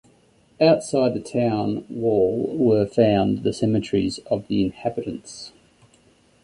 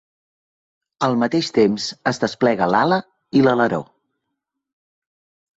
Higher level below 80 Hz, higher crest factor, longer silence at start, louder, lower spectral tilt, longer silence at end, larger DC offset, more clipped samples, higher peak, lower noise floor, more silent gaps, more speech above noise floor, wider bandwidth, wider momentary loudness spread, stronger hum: first, -52 dBFS vs -60 dBFS; about the same, 18 dB vs 18 dB; second, 0.6 s vs 1 s; second, -22 LUFS vs -19 LUFS; about the same, -6.5 dB/octave vs -5.5 dB/octave; second, 0.95 s vs 1.75 s; neither; neither; about the same, -4 dBFS vs -2 dBFS; second, -58 dBFS vs -79 dBFS; neither; second, 37 dB vs 61 dB; first, 11 kHz vs 8.2 kHz; first, 12 LU vs 6 LU; neither